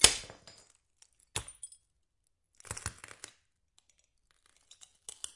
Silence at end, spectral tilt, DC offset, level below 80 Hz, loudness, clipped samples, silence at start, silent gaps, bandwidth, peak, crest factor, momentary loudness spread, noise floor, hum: 2.45 s; 0 dB/octave; under 0.1%; -58 dBFS; -35 LUFS; under 0.1%; 0 s; none; 11.5 kHz; -2 dBFS; 36 dB; 17 LU; -80 dBFS; none